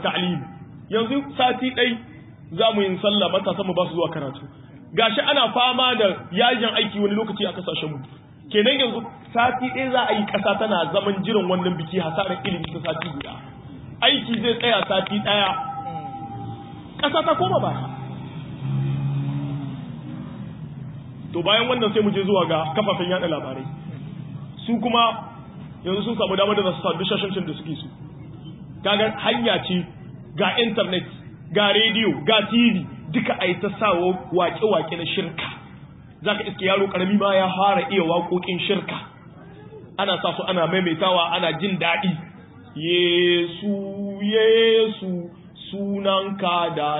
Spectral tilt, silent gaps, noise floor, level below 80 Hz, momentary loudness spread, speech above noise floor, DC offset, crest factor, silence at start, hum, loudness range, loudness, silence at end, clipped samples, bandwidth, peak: -10 dB/octave; none; -43 dBFS; -56 dBFS; 17 LU; 22 dB; under 0.1%; 20 dB; 0 s; none; 5 LU; -21 LUFS; 0 s; under 0.1%; 4 kHz; -4 dBFS